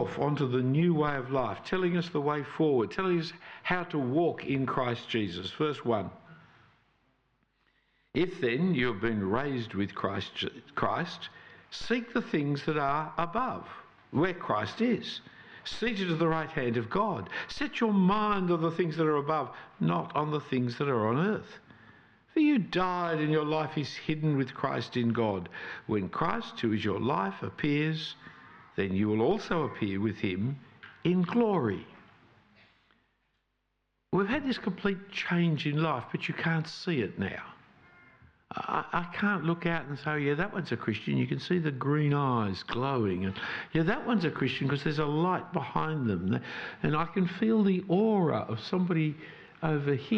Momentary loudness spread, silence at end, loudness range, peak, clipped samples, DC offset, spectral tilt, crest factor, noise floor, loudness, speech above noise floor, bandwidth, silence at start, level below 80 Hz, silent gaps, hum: 9 LU; 0 s; 4 LU; -14 dBFS; under 0.1%; under 0.1%; -7.5 dB/octave; 16 dB; -79 dBFS; -30 LUFS; 49 dB; 8 kHz; 0 s; -60 dBFS; none; none